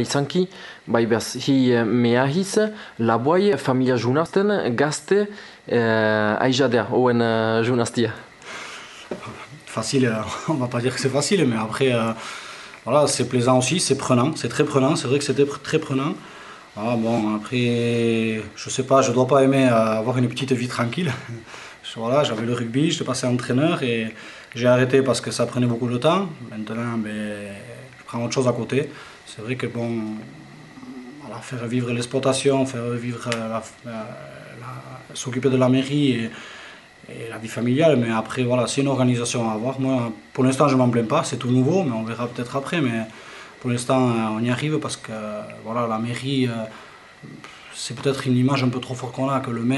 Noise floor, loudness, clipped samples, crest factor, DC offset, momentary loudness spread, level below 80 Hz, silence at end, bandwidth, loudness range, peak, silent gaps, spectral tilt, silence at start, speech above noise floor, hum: -43 dBFS; -21 LUFS; under 0.1%; 20 dB; under 0.1%; 18 LU; -62 dBFS; 0 s; 11.5 kHz; 6 LU; -2 dBFS; none; -5.5 dB/octave; 0 s; 22 dB; none